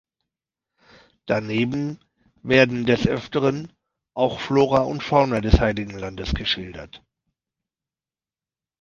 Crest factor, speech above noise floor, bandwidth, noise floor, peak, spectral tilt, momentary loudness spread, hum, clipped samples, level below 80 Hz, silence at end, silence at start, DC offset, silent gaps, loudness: 22 dB; over 69 dB; 7.4 kHz; under -90 dBFS; -2 dBFS; -6.5 dB/octave; 19 LU; none; under 0.1%; -34 dBFS; 1.85 s; 1.25 s; under 0.1%; none; -22 LUFS